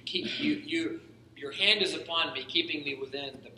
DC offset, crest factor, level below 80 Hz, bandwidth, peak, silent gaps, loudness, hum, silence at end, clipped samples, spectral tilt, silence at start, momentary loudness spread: under 0.1%; 24 dB; -72 dBFS; 11.5 kHz; -8 dBFS; none; -29 LUFS; none; 0 s; under 0.1%; -3 dB/octave; 0.05 s; 14 LU